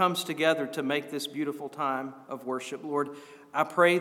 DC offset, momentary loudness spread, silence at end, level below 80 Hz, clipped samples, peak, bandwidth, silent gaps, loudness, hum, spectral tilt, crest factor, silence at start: under 0.1%; 10 LU; 0 s; under -90 dBFS; under 0.1%; -8 dBFS; 18 kHz; none; -30 LUFS; none; -4.5 dB/octave; 20 dB; 0 s